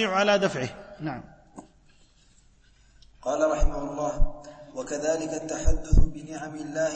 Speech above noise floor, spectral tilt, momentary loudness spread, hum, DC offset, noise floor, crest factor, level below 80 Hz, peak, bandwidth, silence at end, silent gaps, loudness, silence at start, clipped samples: 35 dB; -5 dB/octave; 17 LU; none; under 0.1%; -58 dBFS; 18 dB; -30 dBFS; -8 dBFS; 8.6 kHz; 0 s; none; -28 LUFS; 0 s; under 0.1%